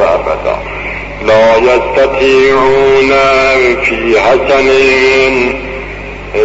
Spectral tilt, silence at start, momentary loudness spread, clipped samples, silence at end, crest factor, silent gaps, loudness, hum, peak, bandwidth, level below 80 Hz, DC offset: -4.5 dB/octave; 0 s; 12 LU; under 0.1%; 0 s; 8 dB; none; -8 LUFS; none; 0 dBFS; 8 kHz; -30 dBFS; under 0.1%